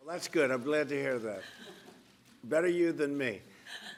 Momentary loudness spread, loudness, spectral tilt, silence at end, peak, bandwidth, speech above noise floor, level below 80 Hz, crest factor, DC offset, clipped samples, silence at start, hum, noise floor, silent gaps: 18 LU; -32 LUFS; -5 dB/octave; 0 s; -16 dBFS; 15.5 kHz; 28 dB; -80 dBFS; 18 dB; under 0.1%; under 0.1%; 0.05 s; none; -60 dBFS; none